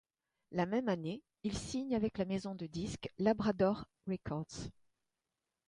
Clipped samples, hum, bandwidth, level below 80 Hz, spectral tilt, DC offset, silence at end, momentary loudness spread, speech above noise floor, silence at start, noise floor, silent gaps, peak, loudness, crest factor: under 0.1%; none; 11 kHz; -60 dBFS; -6 dB/octave; under 0.1%; 0.95 s; 10 LU; 53 dB; 0.5 s; -90 dBFS; none; -18 dBFS; -38 LUFS; 20 dB